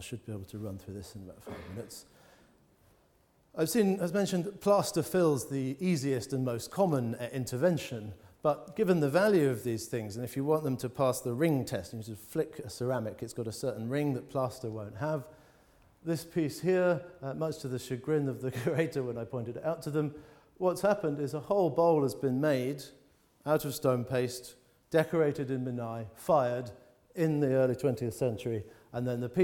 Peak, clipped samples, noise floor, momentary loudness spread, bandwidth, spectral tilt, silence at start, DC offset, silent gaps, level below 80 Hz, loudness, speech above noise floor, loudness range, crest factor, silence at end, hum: -14 dBFS; under 0.1%; -68 dBFS; 15 LU; 19 kHz; -6.5 dB/octave; 0 s; under 0.1%; none; -66 dBFS; -32 LUFS; 36 dB; 5 LU; 18 dB; 0 s; none